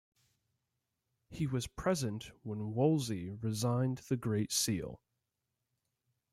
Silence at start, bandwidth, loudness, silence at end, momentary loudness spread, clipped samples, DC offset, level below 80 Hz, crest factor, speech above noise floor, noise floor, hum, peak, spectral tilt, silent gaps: 1.3 s; 15.5 kHz; -35 LUFS; 1.35 s; 11 LU; under 0.1%; under 0.1%; -62 dBFS; 18 dB; 52 dB; -87 dBFS; none; -18 dBFS; -5 dB/octave; none